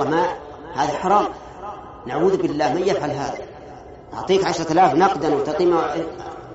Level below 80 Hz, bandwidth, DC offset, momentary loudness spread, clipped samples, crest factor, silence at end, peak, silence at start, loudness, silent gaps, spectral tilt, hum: -50 dBFS; 8 kHz; under 0.1%; 18 LU; under 0.1%; 16 dB; 0 s; -4 dBFS; 0 s; -20 LUFS; none; -4.5 dB/octave; none